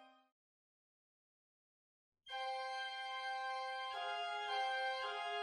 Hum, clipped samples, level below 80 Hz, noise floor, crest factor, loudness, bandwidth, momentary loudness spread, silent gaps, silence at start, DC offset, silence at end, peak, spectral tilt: none; under 0.1%; under -90 dBFS; under -90 dBFS; 16 dB; -42 LUFS; 11 kHz; 5 LU; 0.32-2.12 s; 0 s; under 0.1%; 0 s; -28 dBFS; 1.5 dB/octave